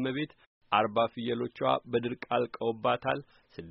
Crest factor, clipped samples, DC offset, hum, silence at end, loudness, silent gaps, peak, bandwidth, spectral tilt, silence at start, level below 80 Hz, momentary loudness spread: 20 dB; under 0.1%; under 0.1%; none; 0 s; -31 LUFS; 0.47-0.61 s; -10 dBFS; 5.8 kHz; -3.5 dB/octave; 0 s; -68 dBFS; 8 LU